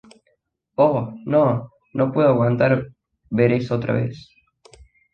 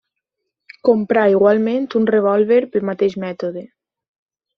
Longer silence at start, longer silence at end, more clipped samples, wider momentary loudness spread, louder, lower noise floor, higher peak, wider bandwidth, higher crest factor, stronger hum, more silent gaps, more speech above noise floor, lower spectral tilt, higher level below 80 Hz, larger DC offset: about the same, 0.8 s vs 0.85 s; about the same, 0.95 s vs 0.9 s; neither; about the same, 11 LU vs 11 LU; second, -20 LUFS vs -17 LUFS; second, -68 dBFS vs -79 dBFS; about the same, -4 dBFS vs -2 dBFS; first, 8.6 kHz vs 6.4 kHz; about the same, 18 dB vs 16 dB; neither; neither; second, 49 dB vs 63 dB; first, -9.5 dB/octave vs -6 dB/octave; first, -54 dBFS vs -62 dBFS; neither